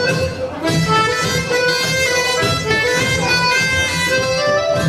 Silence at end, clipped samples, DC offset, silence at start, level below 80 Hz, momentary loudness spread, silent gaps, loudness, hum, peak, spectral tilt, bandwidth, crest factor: 0 s; under 0.1%; under 0.1%; 0 s; -42 dBFS; 4 LU; none; -15 LUFS; none; -2 dBFS; -3.5 dB/octave; 16 kHz; 14 dB